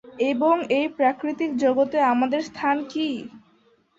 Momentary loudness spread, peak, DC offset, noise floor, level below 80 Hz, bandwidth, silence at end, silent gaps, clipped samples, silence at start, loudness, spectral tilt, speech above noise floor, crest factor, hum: 7 LU; -8 dBFS; under 0.1%; -61 dBFS; -68 dBFS; 7.8 kHz; 0.6 s; none; under 0.1%; 0.05 s; -23 LUFS; -5 dB/octave; 39 dB; 16 dB; none